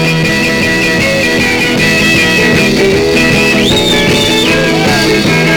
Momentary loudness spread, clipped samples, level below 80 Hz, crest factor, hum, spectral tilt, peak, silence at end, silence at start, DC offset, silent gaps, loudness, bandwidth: 2 LU; under 0.1%; -30 dBFS; 8 dB; none; -4 dB/octave; 0 dBFS; 0 s; 0 s; 0.2%; none; -8 LUFS; 19 kHz